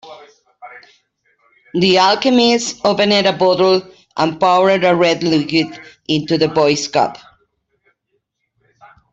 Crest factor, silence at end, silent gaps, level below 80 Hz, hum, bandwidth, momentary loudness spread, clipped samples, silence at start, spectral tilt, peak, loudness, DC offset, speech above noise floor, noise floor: 14 dB; 1.95 s; none; -58 dBFS; none; 8 kHz; 8 LU; under 0.1%; 0.05 s; -4.5 dB/octave; -2 dBFS; -14 LUFS; under 0.1%; 56 dB; -70 dBFS